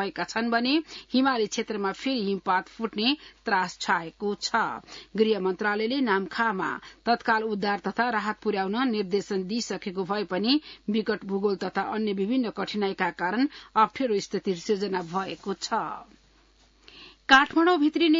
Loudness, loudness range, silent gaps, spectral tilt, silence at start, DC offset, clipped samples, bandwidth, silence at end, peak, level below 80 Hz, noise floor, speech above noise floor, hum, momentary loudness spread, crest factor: -26 LUFS; 2 LU; none; -4.5 dB/octave; 0 s; under 0.1%; under 0.1%; 7.8 kHz; 0 s; -4 dBFS; -64 dBFS; -60 dBFS; 34 dB; none; 7 LU; 22 dB